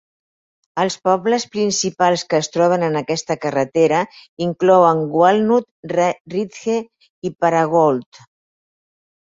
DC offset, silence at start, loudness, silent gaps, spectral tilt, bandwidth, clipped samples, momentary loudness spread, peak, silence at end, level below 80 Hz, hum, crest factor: under 0.1%; 0.75 s; -17 LUFS; 4.29-4.37 s, 5.71-5.83 s, 6.20-6.25 s, 7.10-7.22 s; -5 dB/octave; 8 kHz; under 0.1%; 10 LU; -2 dBFS; 1.35 s; -62 dBFS; none; 16 dB